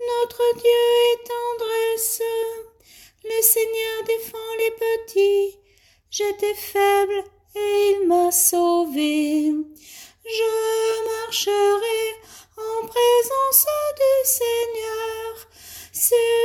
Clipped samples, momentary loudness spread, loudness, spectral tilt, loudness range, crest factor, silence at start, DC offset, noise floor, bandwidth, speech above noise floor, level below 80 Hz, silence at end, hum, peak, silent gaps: under 0.1%; 14 LU; -20 LUFS; -1 dB/octave; 3 LU; 20 dB; 0 s; under 0.1%; -58 dBFS; 17 kHz; 38 dB; -62 dBFS; 0 s; none; 0 dBFS; none